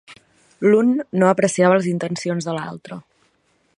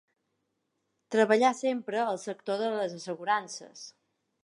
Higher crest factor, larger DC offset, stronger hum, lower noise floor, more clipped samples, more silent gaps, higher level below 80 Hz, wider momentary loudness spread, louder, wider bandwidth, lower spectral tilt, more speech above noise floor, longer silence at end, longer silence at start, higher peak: about the same, 18 dB vs 20 dB; neither; neither; second, -64 dBFS vs -80 dBFS; neither; neither; first, -66 dBFS vs -86 dBFS; about the same, 17 LU vs 18 LU; first, -18 LUFS vs -29 LUFS; about the same, 11 kHz vs 11.5 kHz; first, -6 dB/octave vs -4 dB/octave; second, 46 dB vs 51 dB; first, 0.75 s vs 0.55 s; second, 0.1 s vs 1.1 s; first, -2 dBFS vs -10 dBFS